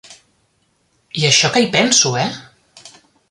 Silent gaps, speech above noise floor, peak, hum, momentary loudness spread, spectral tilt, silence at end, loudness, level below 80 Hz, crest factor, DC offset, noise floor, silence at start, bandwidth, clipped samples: none; 48 dB; 0 dBFS; none; 14 LU; -2.5 dB/octave; 0.4 s; -13 LUFS; -58 dBFS; 18 dB; under 0.1%; -63 dBFS; 0.1 s; 11.5 kHz; under 0.1%